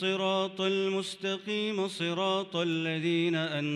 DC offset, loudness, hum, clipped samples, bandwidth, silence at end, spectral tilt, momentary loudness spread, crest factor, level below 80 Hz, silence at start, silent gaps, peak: under 0.1%; -30 LUFS; none; under 0.1%; 12 kHz; 0 s; -5 dB/octave; 4 LU; 12 dB; -80 dBFS; 0 s; none; -18 dBFS